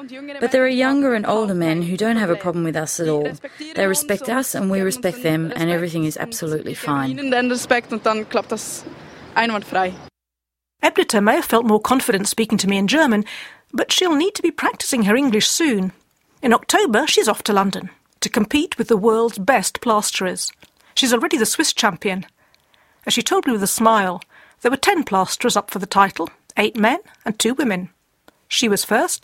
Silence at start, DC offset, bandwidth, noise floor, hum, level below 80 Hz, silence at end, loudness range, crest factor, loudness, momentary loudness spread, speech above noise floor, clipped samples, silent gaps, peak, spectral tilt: 0 s; under 0.1%; 16.5 kHz; -84 dBFS; none; -58 dBFS; 0.05 s; 4 LU; 20 dB; -19 LUFS; 9 LU; 65 dB; under 0.1%; none; 0 dBFS; -3.5 dB/octave